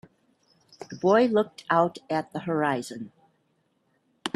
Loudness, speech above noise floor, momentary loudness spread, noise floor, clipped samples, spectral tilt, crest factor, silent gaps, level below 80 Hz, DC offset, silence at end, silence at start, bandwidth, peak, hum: -25 LUFS; 46 dB; 21 LU; -71 dBFS; under 0.1%; -6 dB/octave; 20 dB; none; -72 dBFS; under 0.1%; 0.05 s; 0.8 s; 13 kHz; -6 dBFS; none